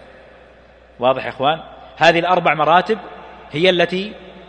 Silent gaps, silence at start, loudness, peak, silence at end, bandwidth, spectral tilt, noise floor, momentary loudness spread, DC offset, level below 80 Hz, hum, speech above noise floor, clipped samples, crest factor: none; 1 s; -16 LUFS; 0 dBFS; 0.05 s; 9.4 kHz; -5 dB/octave; -46 dBFS; 16 LU; under 0.1%; -52 dBFS; none; 30 dB; under 0.1%; 18 dB